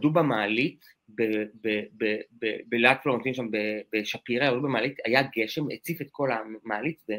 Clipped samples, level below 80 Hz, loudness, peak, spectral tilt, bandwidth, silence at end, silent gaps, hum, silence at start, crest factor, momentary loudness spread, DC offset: under 0.1%; -72 dBFS; -27 LUFS; -2 dBFS; -6 dB/octave; 16 kHz; 0 s; none; none; 0 s; 24 dB; 9 LU; under 0.1%